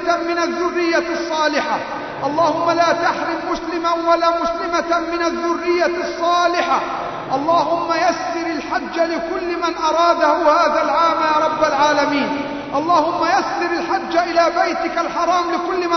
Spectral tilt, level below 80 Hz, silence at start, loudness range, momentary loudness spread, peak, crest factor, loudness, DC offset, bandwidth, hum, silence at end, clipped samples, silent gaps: -3.5 dB/octave; -50 dBFS; 0 s; 3 LU; 7 LU; -2 dBFS; 16 dB; -18 LUFS; under 0.1%; 6.4 kHz; none; 0 s; under 0.1%; none